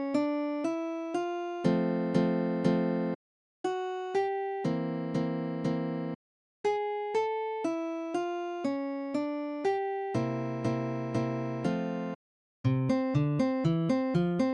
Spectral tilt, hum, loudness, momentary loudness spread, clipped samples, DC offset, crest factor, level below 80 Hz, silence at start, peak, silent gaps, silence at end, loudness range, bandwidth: -8 dB/octave; none; -31 LUFS; 6 LU; under 0.1%; under 0.1%; 18 dB; -64 dBFS; 0 s; -14 dBFS; 3.15-3.64 s, 6.15-6.64 s, 12.15-12.64 s; 0 s; 3 LU; 10.5 kHz